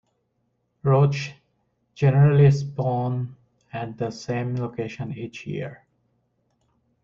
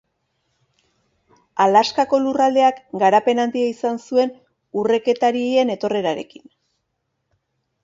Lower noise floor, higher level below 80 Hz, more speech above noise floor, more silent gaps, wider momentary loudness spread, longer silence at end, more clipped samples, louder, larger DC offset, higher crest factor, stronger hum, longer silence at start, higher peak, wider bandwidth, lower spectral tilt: about the same, -72 dBFS vs -74 dBFS; first, -58 dBFS vs -68 dBFS; second, 51 dB vs 56 dB; neither; first, 17 LU vs 9 LU; second, 1.3 s vs 1.6 s; neither; second, -23 LUFS vs -19 LUFS; neither; about the same, 18 dB vs 18 dB; neither; second, 0.85 s vs 1.55 s; second, -6 dBFS vs -2 dBFS; second, 7 kHz vs 7.8 kHz; first, -8 dB/octave vs -5 dB/octave